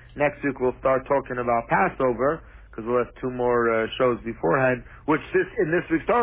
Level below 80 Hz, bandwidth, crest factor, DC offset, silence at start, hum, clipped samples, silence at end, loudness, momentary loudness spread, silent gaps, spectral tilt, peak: -48 dBFS; 3.9 kHz; 16 dB; under 0.1%; 0.15 s; none; under 0.1%; 0 s; -24 LUFS; 5 LU; none; -10.5 dB/octave; -8 dBFS